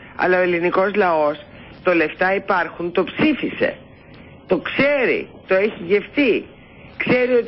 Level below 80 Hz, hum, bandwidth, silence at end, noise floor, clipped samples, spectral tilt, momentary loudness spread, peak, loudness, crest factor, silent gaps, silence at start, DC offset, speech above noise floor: -52 dBFS; none; 5.8 kHz; 0 s; -42 dBFS; under 0.1%; -10.5 dB/octave; 7 LU; -6 dBFS; -19 LUFS; 12 dB; none; 0 s; under 0.1%; 24 dB